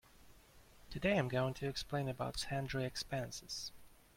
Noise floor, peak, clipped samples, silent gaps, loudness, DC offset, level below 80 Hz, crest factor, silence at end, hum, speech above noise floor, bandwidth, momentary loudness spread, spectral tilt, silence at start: -62 dBFS; -20 dBFS; under 0.1%; none; -40 LUFS; under 0.1%; -60 dBFS; 20 dB; 0.25 s; none; 23 dB; 16.5 kHz; 10 LU; -5 dB/octave; 0.15 s